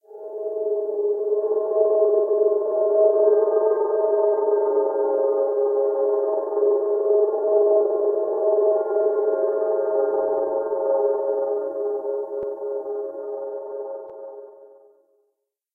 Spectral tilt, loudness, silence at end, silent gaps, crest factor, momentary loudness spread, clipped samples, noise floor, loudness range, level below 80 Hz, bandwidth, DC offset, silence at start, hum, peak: -9.5 dB/octave; -22 LUFS; 1.1 s; none; 16 dB; 12 LU; under 0.1%; -75 dBFS; 9 LU; -78 dBFS; 1.9 kHz; under 0.1%; 0.1 s; none; -6 dBFS